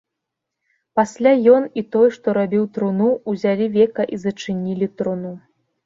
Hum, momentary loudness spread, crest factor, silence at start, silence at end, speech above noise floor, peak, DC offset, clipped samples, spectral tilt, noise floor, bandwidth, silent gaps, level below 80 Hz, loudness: none; 10 LU; 18 dB; 0.95 s; 0.45 s; 63 dB; -2 dBFS; under 0.1%; under 0.1%; -7 dB/octave; -81 dBFS; 7.8 kHz; none; -62 dBFS; -19 LUFS